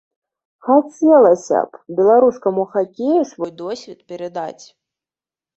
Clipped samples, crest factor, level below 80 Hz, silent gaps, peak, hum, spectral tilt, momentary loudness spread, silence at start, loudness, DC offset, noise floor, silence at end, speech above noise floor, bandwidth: under 0.1%; 16 dB; -64 dBFS; none; -2 dBFS; none; -6.5 dB/octave; 18 LU; 0.65 s; -16 LUFS; under 0.1%; under -90 dBFS; 1.05 s; over 74 dB; 8.2 kHz